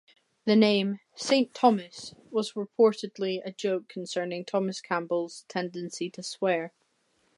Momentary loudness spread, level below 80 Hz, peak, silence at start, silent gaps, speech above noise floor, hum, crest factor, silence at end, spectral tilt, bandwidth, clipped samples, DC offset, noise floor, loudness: 12 LU; -80 dBFS; -8 dBFS; 0.45 s; none; 43 dB; none; 20 dB; 0.7 s; -5 dB/octave; 11.5 kHz; under 0.1%; under 0.1%; -71 dBFS; -28 LUFS